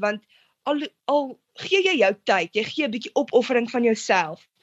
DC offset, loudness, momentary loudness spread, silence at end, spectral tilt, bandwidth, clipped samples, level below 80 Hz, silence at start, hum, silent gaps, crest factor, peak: under 0.1%; -22 LUFS; 11 LU; 0.25 s; -3.5 dB/octave; 8.2 kHz; under 0.1%; -74 dBFS; 0 s; none; none; 18 dB; -6 dBFS